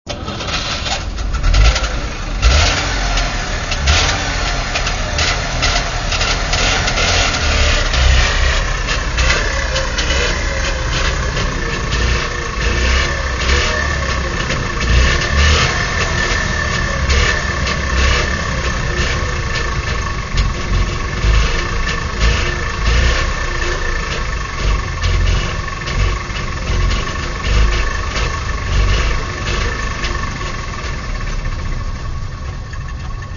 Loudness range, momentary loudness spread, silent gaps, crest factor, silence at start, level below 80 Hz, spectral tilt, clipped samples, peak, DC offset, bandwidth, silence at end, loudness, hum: 5 LU; 9 LU; none; 16 dB; 0.05 s; -18 dBFS; -3.5 dB/octave; under 0.1%; 0 dBFS; under 0.1%; 7.4 kHz; 0 s; -17 LUFS; none